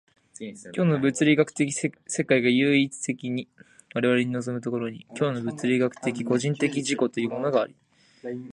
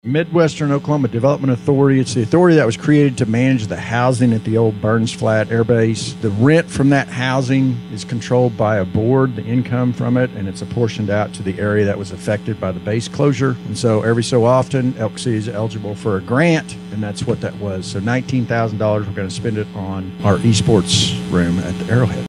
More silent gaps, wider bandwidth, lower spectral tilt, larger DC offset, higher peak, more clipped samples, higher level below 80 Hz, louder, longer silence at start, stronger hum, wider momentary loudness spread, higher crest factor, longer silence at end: neither; about the same, 11 kHz vs 11.5 kHz; about the same, -5 dB/octave vs -6 dB/octave; neither; second, -6 dBFS vs 0 dBFS; neither; second, -70 dBFS vs -46 dBFS; second, -25 LUFS vs -17 LUFS; first, 0.4 s vs 0.05 s; neither; first, 13 LU vs 9 LU; about the same, 20 dB vs 16 dB; about the same, 0 s vs 0 s